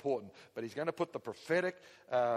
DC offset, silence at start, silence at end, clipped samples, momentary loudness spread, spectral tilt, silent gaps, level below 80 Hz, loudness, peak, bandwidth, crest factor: under 0.1%; 0.05 s; 0 s; under 0.1%; 11 LU; -6 dB/octave; none; -80 dBFS; -37 LUFS; -20 dBFS; 13.5 kHz; 16 dB